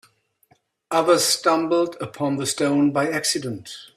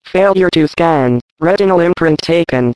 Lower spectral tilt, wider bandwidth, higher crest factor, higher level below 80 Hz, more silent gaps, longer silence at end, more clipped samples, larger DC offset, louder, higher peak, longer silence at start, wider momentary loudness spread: second, -3.5 dB/octave vs -7 dB/octave; first, 15.5 kHz vs 11 kHz; first, 18 dB vs 12 dB; second, -66 dBFS vs -44 dBFS; second, none vs 1.21-1.36 s; about the same, 0.1 s vs 0 s; neither; second, under 0.1% vs 0.6%; second, -21 LUFS vs -12 LUFS; second, -4 dBFS vs 0 dBFS; first, 0.9 s vs 0.05 s; first, 10 LU vs 4 LU